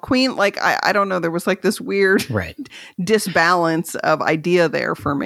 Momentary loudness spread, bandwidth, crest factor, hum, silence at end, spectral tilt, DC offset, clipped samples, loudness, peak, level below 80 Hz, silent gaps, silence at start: 9 LU; 16 kHz; 18 dB; none; 0 s; -4.5 dB/octave; under 0.1%; under 0.1%; -18 LUFS; 0 dBFS; -54 dBFS; none; 0.05 s